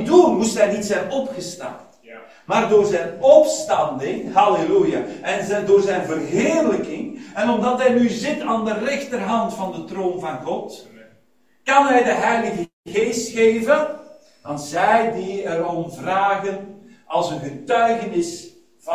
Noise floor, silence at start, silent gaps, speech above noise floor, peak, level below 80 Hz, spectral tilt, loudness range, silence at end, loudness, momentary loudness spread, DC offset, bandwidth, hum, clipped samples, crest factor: -62 dBFS; 0 s; 12.73-12.83 s; 43 dB; 0 dBFS; -60 dBFS; -4.5 dB/octave; 5 LU; 0 s; -19 LUFS; 13 LU; 0.1%; 15.5 kHz; none; under 0.1%; 20 dB